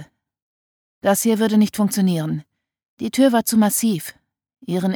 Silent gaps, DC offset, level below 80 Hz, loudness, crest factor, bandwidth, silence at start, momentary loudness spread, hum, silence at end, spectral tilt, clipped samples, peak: 0.42-1.01 s, 2.88-2.97 s; under 0.1%; -64 dBFS; -19 LUFS; 16 dB; over 20 kHz; 0 s; 13 LU; none; 0 s; -5 dB/octave; under 0.1%; -4 dBFS